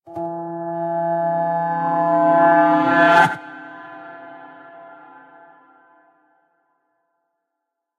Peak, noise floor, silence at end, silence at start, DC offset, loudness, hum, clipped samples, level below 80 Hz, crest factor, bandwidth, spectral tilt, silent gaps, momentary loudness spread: -2 dBFS; -80 dBFS; 3.05 s; 0.05 s; under 0.1%; -17 LUFS; none; under 0.1%; -70 dBFS; 20 dB; 11 kHz; -6.5 dB/octave; none; 24 LU